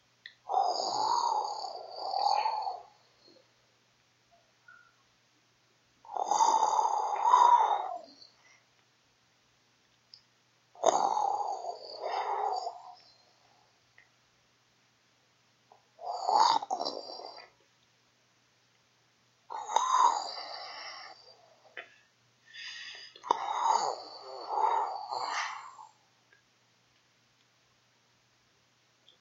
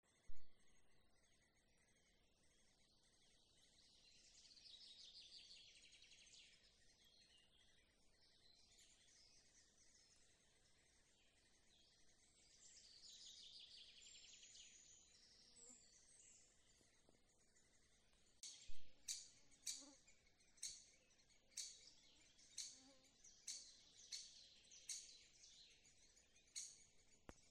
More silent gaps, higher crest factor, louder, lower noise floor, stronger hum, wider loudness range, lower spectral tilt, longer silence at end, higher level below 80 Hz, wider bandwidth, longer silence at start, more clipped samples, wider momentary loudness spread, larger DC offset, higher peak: neither; about the same, 26 dB vs 24 dB; first, -30 LUFS vs -59 LUFS; second, -69 dBFS vs -79 dBFS; neither; about the same, 13 LU vs 11 LU; about the same, -0.5 dB/octave vs 0.5 dB/octave; first, 3.35 s vs 0 s; second, under -90 dBFS vs -78 dBFS; second, 8 kHz vs 11.5 kHz; first, 0.25 s vs 0.05 s; neither; first, 21 LU vs 14 LU; neither; first, -8 dBFS vs -34 dBFS